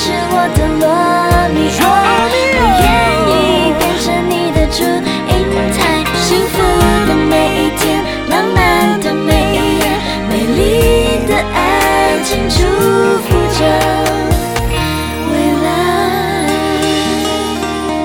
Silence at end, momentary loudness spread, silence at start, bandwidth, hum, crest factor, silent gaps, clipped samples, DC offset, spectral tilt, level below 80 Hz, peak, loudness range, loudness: 0 s; 5 LU; 0 s; 19.5 kHz; none; 12 dB; none; under 0.1%; 0.1%; -4.5 dB/octave; -24 dBFS; 0 dBFS; 3 LU; -12 LUFS